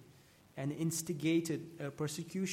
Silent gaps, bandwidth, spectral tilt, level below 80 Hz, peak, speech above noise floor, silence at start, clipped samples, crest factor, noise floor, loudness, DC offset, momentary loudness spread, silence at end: none; 16.5 kHz; -5 dB/octave; -76 dBFS; -22 dBFS; 26 dB; 0 s; under 0.1%; 16 dB; -63 dBFS; -37 LUFS; under 0.1%; 9 LU; 0 s